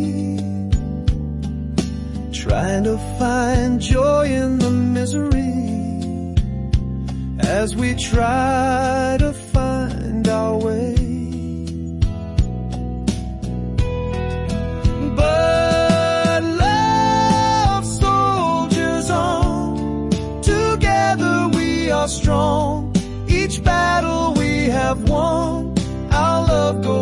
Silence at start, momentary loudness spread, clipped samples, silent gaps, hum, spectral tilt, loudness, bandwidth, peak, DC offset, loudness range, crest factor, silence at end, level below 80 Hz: 0 s; 8 LU; under 0.1%; none; none; -6 dB/octave; -19 LUFS; 11.5 kHz; -6 dBFS; under 0.1%; 5 LU; 12 dB; 0 s; -26 dBFS